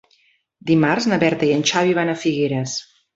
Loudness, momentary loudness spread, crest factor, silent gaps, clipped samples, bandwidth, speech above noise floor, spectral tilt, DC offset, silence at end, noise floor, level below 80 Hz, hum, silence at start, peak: -19 LUFS; 9 LU; 18 dB; none; under 0.1%; 8 kHz; 42 dB; -5 dB/octave; under 0.1%; 0.3 s; -60 dBFS; -58 dBFS; none; 0.65 s; -2 dBFS